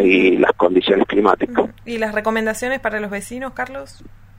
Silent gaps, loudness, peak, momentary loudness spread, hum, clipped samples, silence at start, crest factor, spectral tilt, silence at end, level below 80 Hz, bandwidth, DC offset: none; -18 LUFS; 0 dBFS; 13 LU; none; under 0.1%; 0 s; 18 dB; -5 dB/octave; 0.3 s; -46 dBFS; 16 kHz; under 0.1%